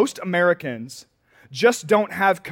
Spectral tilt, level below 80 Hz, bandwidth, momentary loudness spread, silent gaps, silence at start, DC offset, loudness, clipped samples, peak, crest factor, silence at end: -4.5 dB/octave; -68 dBFS; 17 kHz; 18 LU; none; 0 s; under 0.1%; -20 LUFS; under 0.1%; -4 dBFS; 16 dB; 0 s